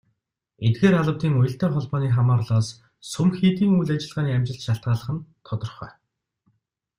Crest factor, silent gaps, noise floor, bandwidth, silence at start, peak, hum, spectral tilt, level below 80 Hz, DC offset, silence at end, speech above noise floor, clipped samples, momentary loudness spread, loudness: 18 dB; none; -74 dBFS; 11.5 kHz; 0.6 s; -6 dBFS; none; -7.5 dB/octave; -54 dBFS; under 0.1%; 1.1 s; 53 dB; under 0.1%; 14 LU; -23 LUFS